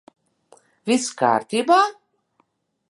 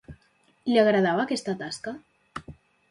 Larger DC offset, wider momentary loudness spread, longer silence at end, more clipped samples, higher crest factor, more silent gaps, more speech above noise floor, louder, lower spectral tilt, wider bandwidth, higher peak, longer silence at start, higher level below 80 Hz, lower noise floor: neither; second, 6 LU vs 21 LU; first, 1 s vs 0.4 s; neither; about the same, 20 dB vs 20 dB; neither; first, 48 dB vs 41 dB; first, -20 LUFS vs -25 LUFS; second, -3.5 dB/octave vs -5.5 dB/octave; about the same, 11.5 kHz vs 11.5 kHz; first, -4 dBFS vs -8 dBFS; first, 0.85 s vs 0.1 s; second, -78 dBFS vs -60 dBFS; about the same, -67 dBFS vs -65 dBFS